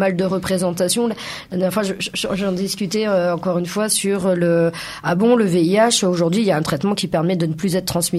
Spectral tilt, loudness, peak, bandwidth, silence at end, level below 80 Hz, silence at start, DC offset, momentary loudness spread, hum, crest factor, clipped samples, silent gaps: -4.5 dB/octave; -19 LUFS; -4 dBFS; 15.5 kHz; 0 s; -52 dBFS; 0 s; under 0.1%; 7 LU; none; 14 dB; under 0.1%; none